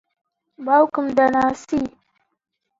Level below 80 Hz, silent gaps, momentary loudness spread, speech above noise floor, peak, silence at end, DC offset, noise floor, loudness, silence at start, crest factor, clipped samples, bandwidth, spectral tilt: -56 dBFS; none; 11 LU; 58 dB; -2 dBFS; 0.9 s; under 0.1%; -76 dBFS; -19 LUFS; 0.6 s; 18 dB; under 0.1%; 7.8 kHz; -6 dB/octave